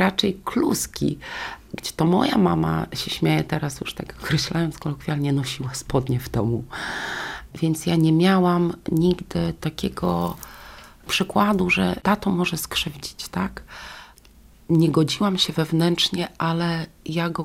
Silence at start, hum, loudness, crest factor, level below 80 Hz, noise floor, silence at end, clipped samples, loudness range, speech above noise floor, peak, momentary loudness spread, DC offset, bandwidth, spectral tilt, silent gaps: 0 s; none; -23 LUFS; 18 dB; -46 dBFS; -50 dBFS; 0 s; under 0.1%; 3 LU; 28 dB; -4 dBFS; 13 LU; under 0.1%; 16 kHz; -5.5 dB/octave; none